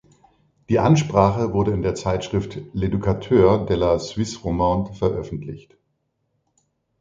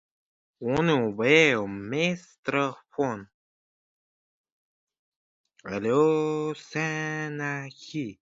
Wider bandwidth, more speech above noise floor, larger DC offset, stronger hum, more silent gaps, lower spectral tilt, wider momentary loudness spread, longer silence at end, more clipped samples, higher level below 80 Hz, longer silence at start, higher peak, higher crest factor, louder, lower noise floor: about the same, 7.8 kHz vs 7.8 kHz; second, 52 dB vs over 64 dB; neither; neither; second, none vs 2.38-2.43 s, 3.34-4.44 s, 4.52-4.87 s, 4.99-5.44 s; first, -7 dB/octave vs -5.5 dB/octave; second, 12 LU vs 15 LU; first, 1.4 s vs 0.25 s; neither; first, -40 dBFS vs -64 dBFS; about the same, 0.7 s vs 0.6 s; first, 0 dBFS vs -6 dBFS; about the same, 20 dB vs 22 dB; first, -21 LUFS vs -26 LUFS; second, -72 dBFS vs under -90 dBFS